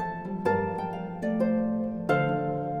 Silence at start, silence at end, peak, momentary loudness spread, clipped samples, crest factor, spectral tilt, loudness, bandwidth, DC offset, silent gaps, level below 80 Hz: 0 s; 0 s; -12 dBFS; 7 LU; under 0.1%; 16 dB; -8.5 dB/octave; -28 LUFS; 10.5 kHz; under 0.1%; none; -56 dBFS